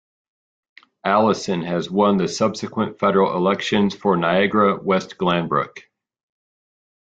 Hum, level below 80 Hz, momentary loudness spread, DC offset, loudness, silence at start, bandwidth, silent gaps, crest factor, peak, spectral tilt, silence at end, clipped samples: none; -58 dBFS; 6 LU; under 0.1%; -20 LUFS; 1.05 s; 8 kHz; none; 18 dB; -4 dBFS; -5.5 dB/octave; 1.35 s; under 0.1%